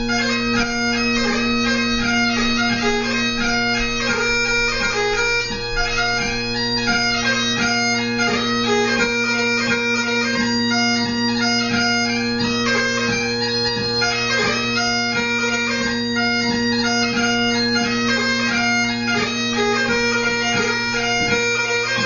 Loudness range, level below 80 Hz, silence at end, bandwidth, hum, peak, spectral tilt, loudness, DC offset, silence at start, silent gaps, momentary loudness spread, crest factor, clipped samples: 1 LU; -38 dBFS; 0 s; 7.4 kHz; none; -6 dBFS; -3 dB/octave; -18 LUFS; under 0.1%; 0 s; none; 2 LU; 14 dB; under 0.1%